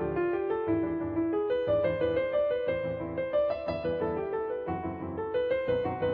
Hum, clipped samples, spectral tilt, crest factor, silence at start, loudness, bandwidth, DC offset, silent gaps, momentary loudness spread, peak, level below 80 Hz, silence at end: none; under 0.1%; -9.5 dB/octave; 12 dB; 0 s; -30 LUFS; 5 kHz; under 0.1%; none; 6 LU; -16 dBFS; -54 dBFS; 0 s